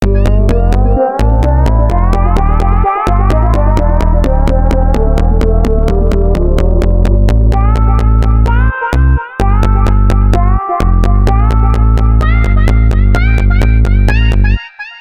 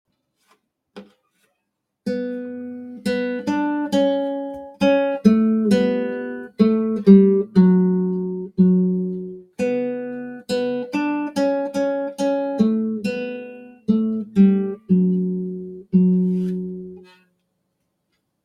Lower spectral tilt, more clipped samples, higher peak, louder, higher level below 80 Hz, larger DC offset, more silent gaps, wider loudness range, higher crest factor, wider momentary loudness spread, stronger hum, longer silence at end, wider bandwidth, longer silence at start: about the same, -8 dB/octave vs -8 dB/octave; neither; about the same, 0 dBFS vs 0 dBFS; first, -11 LUFS vs -20 LUFS; first, -10 dBFS vs -62 dBFS; neither; neither; second, 1 LU vs 7 LU; second, 8 dB vs 20 dB; second, 2 LU vs 15 LU; neither; second, 0 s vs 1.45 s; second, 7 kHz vs 10 kHz; second, 0 s vs 0.95 s